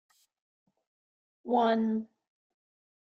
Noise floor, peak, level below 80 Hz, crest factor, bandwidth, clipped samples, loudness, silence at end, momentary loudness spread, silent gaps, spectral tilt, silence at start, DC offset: under -90 dBFS; -16 dBFS; -82 dBFS; 18 dB; 6.2 kHz; under 0.1%; -29 LUFS; 1.05 s; 22 LU; none; -7.5 dB/octave; 1.45 s; under 0.1%